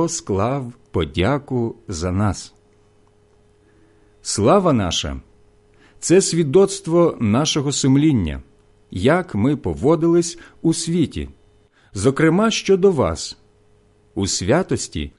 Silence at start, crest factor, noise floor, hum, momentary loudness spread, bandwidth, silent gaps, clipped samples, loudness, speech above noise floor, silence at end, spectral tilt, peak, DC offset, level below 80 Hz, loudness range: 0 s; 16 dB; -55 dBFS; none; 13 LU; 11.5 kHz; none; under 0.1%; -19 LUFS; 37 dB; 0.1 s; -5 dB/octave; -4 dBFS; under 0.1%; -38 dBFS; 6 LU